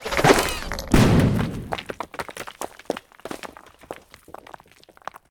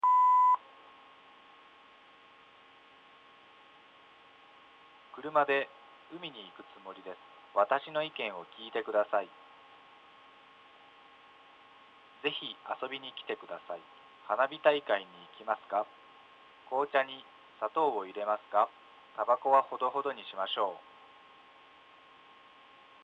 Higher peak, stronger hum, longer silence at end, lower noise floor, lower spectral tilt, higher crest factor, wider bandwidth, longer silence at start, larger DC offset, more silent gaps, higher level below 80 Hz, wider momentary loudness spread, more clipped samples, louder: first, 0 dBFS vs -10 dBFS; neither; second, 0.15 s vs 2.25 s; second, -52 dBFS vs -59 dBFS; about the same, -5 dB/octave vs -5 dB/octave; about the same, 22 dB vs 24 dB; first, 19.5 kHz vs 7.4 kHz; about the same, 0 s vs 0.05 s; neither; neither; first, -36 dBFS vs -86 dBFS; first, 24 LU vs 20 LU; neither; first, -22 LUFS vs -32 LUFS